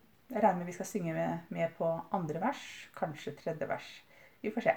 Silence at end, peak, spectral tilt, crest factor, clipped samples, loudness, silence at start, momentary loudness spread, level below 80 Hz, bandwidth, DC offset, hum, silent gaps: 0 s; -14 dBFS; -6 dB/octave; 22 dB; under 0.1%; -36 LUFS; 0.3 s; 11 LU; -76 dBFS; over 20 kHz; under 0.1%; none; none